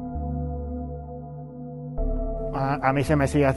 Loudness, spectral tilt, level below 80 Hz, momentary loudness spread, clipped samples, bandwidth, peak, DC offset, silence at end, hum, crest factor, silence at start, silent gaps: -27 LUFS; -7.5 dB/octave; -34 dBFS; 16 LU; under 0.1%; 12 kHz; -6 dBFS; under 0.1%; 0 s; none; 20 dB; 0 s; none